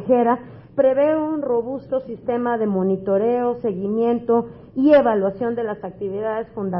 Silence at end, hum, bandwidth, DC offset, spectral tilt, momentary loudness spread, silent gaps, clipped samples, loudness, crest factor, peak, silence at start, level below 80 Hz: 0 s; none; 5.6 kHz; under 0.1%; -12 dB/octave; 11 LU; none; under 0.1%; -21 LUFS; 16 dB; -4 dBFS; 0 s; -56 dBFS